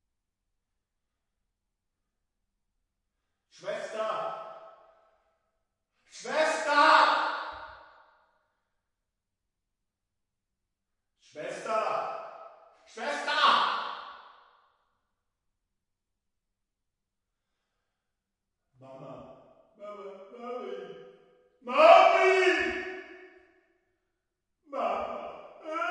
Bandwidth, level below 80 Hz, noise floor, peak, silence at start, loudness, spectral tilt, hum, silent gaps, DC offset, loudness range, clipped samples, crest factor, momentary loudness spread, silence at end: 11 kHz; -74 dBFS; -85 dBFS; -4 dBFS; 3.65 s; -25 LUFS; -2.5 dB/octave; none; none; under 0.1%; 20 LU; under 0.1%; 26 dB; 26 LU; 0 s